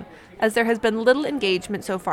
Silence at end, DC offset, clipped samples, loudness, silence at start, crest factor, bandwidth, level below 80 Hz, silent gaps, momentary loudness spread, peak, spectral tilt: 0 s; under 0.1%; under 0.1%; -22 LUFS; 0 s; 18 dB; 16 kHz; -56 dBFS; none; 6 LU; -4 dBFS; -4.5 dB/octave